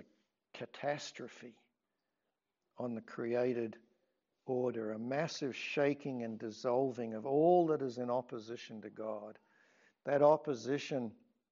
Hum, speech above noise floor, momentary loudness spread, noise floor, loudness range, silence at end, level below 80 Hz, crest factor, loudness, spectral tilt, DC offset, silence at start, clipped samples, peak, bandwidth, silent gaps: none; 52 dB; 19 LU; -88 dBFS; 8 LU; 0.4 s; under -90 dBFS; 20 dB; -36 LUFS; -5 dB/octave; under 0.1%; 0.55 s; under 0.1%; -16 dBFS; 7.4 kHz; none